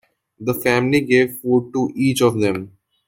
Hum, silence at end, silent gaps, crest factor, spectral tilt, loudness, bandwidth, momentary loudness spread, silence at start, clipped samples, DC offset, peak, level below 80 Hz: none; 0.4 s; none; 18 dB; -5.5 dB/octave; -18 LUFS; 17 kHz; 8 LU; 0.4 s; under 0.1%; under 0.1%; -2 dBFS; -58 dBFS